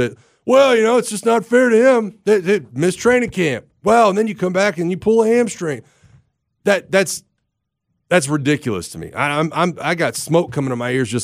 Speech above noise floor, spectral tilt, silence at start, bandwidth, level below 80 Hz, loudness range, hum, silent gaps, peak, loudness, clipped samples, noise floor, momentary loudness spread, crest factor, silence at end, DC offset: 59 dB; -5 dB/octave; 0 s; 16 kHz; -54 dBFS; 5 LU; none; none; -2 dBFS; -17 LUFS; under 0.1%; -75 dBFS; 10 LU; 14 dB; 0 s; under 0.1%